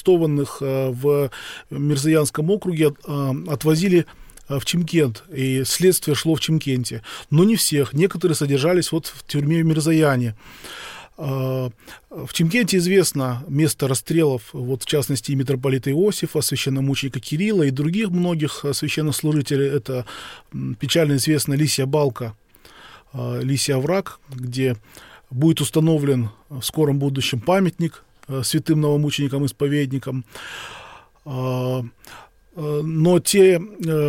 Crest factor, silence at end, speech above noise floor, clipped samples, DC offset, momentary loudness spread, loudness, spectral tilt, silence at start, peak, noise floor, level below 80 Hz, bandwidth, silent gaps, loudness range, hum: 16 dB; 0 s; 27 dB; under 0.1%; under 0.1%; 14 LU; -20 LUFS; -5.5 dB/octave; 0 s; -4 dBFS; -47 dBFS; -54 dBFS; 17 kHz; none; 4 LU; none